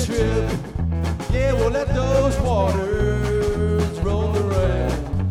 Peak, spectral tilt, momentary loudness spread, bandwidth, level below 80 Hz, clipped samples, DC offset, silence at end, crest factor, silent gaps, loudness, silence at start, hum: -6 dBFS; -7 dB/octave; 5 LU; 13.5 kHz; -26 dBFS; under 0.1%; under 0.1%; 0 s; 12 dB; none; -21 LUFS; 0 s; none